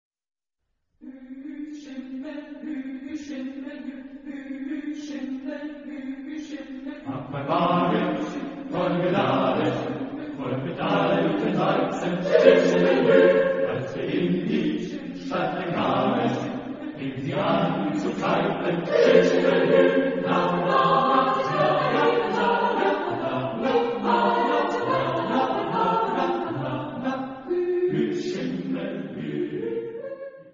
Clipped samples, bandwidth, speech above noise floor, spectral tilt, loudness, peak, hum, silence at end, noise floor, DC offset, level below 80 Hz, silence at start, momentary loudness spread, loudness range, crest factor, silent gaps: under 0.1%; 7.6 kHz; 55 dB; -6.5 dB/octave; -24 LUFS; -2 dBFS; none; 0.05 s; -78 dBFS; under 0.1%; -60 dBFS; 1 s; 17 LU; 14 LU; 22 dB; none